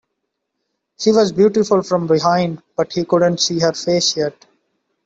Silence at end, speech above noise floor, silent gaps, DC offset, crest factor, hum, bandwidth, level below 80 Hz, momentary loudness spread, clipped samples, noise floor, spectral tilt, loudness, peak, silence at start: 0.75 s; 59 dB; none; under 0.1%; 14 dB; none; 8 kHz; -58 dBFS; 8 LU; under 0.1%; -75 dBFS; -4.5 dB/octave; -16 LUFS; -2 dBFS; 1 s